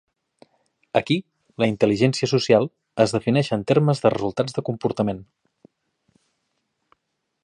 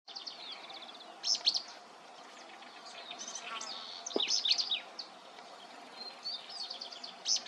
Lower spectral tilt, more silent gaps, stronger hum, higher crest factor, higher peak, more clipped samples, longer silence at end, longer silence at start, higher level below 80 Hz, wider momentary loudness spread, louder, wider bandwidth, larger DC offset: first, -6.5 dB/octave vs 1.5 dB/octave; neither; neither; about the same, 22 dB vs 24 dB; first, -2 dBFS vs -16 dBFS; neither; first, 2.2 s vs 0 s; first, 0.95 s vs 0.05 s; first, -58 dBFS vs under -90 dBFS; second, 7 LU vs 21 LU; first, -22 LUFS vs -35 LUFS; second, 11 kHz vs 13 kHz; neither